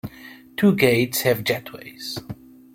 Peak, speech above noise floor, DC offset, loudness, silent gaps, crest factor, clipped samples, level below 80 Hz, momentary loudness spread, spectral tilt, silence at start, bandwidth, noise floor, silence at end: -2 dBFS; 23 dB; under 0.1%; -21 LUFS; none; 20 dB; under 0.1%; -58 dBFS; 22 LU; -5 dB/octave; 0.05 s; 16.5 kHz; -44 dBFS; 0.4 s